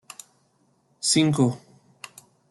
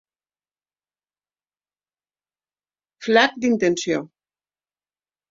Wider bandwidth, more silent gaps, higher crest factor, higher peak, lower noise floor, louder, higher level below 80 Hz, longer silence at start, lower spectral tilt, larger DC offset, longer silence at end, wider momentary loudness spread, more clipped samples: first, 12.5 kHz vs 8 kHz; neither; about the same, 20 dB vs 24 dB; second, -8 dBFS vs -2 dBFS; second, -66 dBFS vs under -90 dBFS; about the same, -22 LUFS vs -20 LUFS; about the same, -64 dBFS vs -68 dBFS; second, 1 s vs 3 s; about the same, -4.5 dB/octave vs -4 dB/octave; neither; second, 0.95 s vs 1.25 s; first, 24 LU vs 10 LU; neither